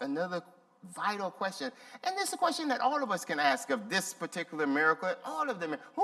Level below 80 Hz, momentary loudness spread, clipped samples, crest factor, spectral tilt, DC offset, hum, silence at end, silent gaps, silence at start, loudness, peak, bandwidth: -88 dBFS; 9 LU; under 0.1%; 20 dB; -3 dB/octave; under 0.1%; none; 0 s; none; 0 s; -32 LUFS; -12 dBFS; 15 kHz